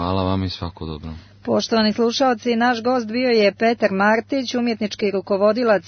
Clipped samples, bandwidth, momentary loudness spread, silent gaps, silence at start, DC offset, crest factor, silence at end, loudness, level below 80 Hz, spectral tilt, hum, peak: under 0.1%; 6.6 kHz; 13 LU; none; 0 s; under 0.1%; 16 dB; 0 s; -19 LUFS; -48 dBFS; -5.5 dB/octave; none; -4 dBFS